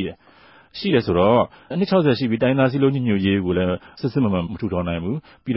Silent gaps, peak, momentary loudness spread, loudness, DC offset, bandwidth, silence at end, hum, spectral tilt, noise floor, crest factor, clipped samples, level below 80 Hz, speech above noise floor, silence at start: none; -4 dBFS; 9 LU; -20 LUFS; under 0.1%; 5.8 kHz; 0 s; none; -12 dB/octave; -50 dBFS; 16 dB; under 0.1%; -42 dBFS; 31 dB; 0 s